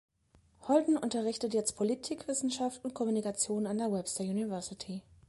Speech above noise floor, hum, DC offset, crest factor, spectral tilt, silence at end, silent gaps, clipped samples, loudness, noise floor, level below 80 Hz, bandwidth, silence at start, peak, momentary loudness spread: 34 dB; none; under 0.1%; 18 dB; -4.5 dB/octave; 0.3 s; none; under 0.1%; -33 LUFS; -67 dBFS; -70 dBFS; 11.5 kHz; 0.6 s; -14 dBFS; 9 LU